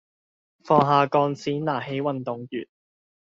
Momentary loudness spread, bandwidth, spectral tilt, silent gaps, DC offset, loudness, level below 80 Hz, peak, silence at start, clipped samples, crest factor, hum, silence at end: 14 LU; 7.6 kHz; -5.5 dB/octave; none; under 0.1%; -23 LUFS; -66 dBFS; -4 dBFS; 0.65 s; under 0.1%; 20 dB; none; 0.6 s